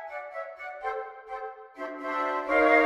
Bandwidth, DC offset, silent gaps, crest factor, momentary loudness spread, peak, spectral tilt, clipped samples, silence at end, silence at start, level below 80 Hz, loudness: 12 kHz; under 0.1%; none; 20 dB; 15 LU; -8 dBFS; -4 dB/octave; under 0.1%; 0 s; 0 s; -62 dBFS; -31 LUFS